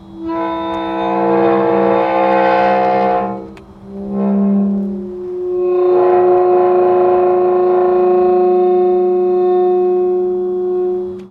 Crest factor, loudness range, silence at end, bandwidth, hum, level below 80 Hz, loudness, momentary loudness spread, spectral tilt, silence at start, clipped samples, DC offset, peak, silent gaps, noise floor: 12 dB; 4 LU; 0.05 s; 5 kHz; none; -50 dBFS; -14 LUFS; 11 LU; -9.5 dB/octave; 0.05 s; under 0.1%; under 0.1%; -2 dBFS; none; -34 dBFS